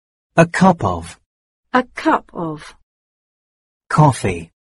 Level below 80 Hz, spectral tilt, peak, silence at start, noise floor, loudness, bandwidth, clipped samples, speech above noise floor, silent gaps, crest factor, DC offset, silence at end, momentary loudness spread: -46 dBFS; -6.5 dB/octave; 0 dBFS; 0.35 s; under -90 dBFS; -17 LUFS; 11.5 kHz; under 0.1%; over 74 dB; 1.26-1.63 s, 2.83-3.80 s; 18 dB; under 0.1%; 0.3 s; 14 LU